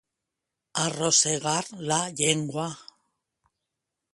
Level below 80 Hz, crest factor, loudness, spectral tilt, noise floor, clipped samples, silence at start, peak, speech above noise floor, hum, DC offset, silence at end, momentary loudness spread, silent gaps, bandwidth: -68 dBFS; 22 dB; -25 LUFS; -2.5 dB/octave; -85 dBFS; under 0.1%; 0.75 s; -8 dBFS; 59 dB; none; under 0.1%; 1.3 s; 13 LU; none; 11.5 kHz